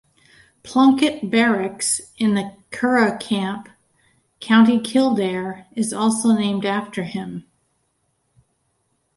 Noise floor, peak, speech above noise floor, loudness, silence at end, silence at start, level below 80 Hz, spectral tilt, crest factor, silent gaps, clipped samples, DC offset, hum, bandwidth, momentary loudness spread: -69 dBFS; -4 dBFS; 50 dB; -19 LUFS; 1.75 s; 0.65 s; -62 dBFS; -4.5 dB/octave; 16 dB; none; under 0.1%; under 0.1%; none; 11.5 kHz; 14 LU